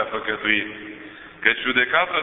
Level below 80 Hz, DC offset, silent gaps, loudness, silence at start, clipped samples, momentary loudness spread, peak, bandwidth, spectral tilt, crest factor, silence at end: -58 dBFS; under 0.1%; none; -20 LUFS; 0 s; under 0.1%; 19 LU; 0 dBFS; 4.1 kHz; -7.5 dB/octave; 22 dB; 0 s